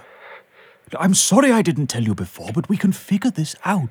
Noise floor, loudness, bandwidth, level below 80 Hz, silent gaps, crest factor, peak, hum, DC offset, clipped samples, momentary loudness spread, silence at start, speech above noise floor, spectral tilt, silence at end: -50 dBFS; -19 LUFS; 19.5 kHz; -58 dBFS; none; 20 dB; 0 dBFS; none; under 0.1%; under 0.1%; 12 LU; 0.25 s; 31 dB; -4.5 dB/octave; 0 s